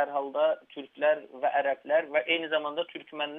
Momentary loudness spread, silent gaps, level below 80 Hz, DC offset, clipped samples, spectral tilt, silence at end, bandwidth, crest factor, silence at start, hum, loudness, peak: 8 LU; none; -88 dBFS; under 0.1%; under 0.1%; -6 dB/octave; 0 s; 3.9 kHz; 16 dB; 0 s; none; -29 LUFS; -14 dBFS